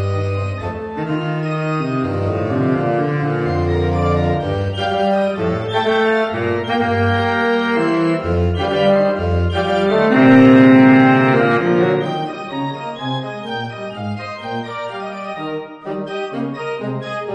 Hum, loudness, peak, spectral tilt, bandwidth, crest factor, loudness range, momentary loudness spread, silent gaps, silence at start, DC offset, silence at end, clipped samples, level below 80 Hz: none; -17 LUFS; 0 dBFS; -8 dB/octave; 8.4 kHz; 16 dB; 13 LU; 15 LU; none; 0 s; under 0.1%; 0 s; under 0.1%; -40 dBFS